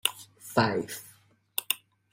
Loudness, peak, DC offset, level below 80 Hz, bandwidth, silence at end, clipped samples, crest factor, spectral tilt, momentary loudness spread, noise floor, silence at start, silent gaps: -30 LUFS; -6 dBFS; under 0.1%; -66 dBFS; 16.5 kHz; 0.35 s; under 0.1%; 26 dB; -3.5 dB/octave; 14 LU; -60 dBFS; 0.05 s; none